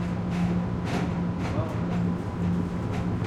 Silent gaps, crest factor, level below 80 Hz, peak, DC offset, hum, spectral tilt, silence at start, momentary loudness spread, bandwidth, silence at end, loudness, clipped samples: none; 12 dB; -42 dBFS; -14 dBFS; under 0.1%; none; -8 dB/octave; 0 s; 2 LU; 9 kHz; 0 s; -28 LUFS; under 0.1%